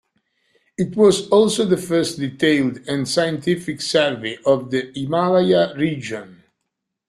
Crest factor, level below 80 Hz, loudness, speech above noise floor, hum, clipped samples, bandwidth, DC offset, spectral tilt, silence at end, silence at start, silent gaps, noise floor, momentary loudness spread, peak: 18 dB; -58 dBFS; -19 LUFS; 60 dB; none; under 0.1%; 13.5 kHz; under 0.1%; -5 dB/octave; 0.75 s; 0.8 s; none; -78 dBFS; 9 LU; -2 dBFS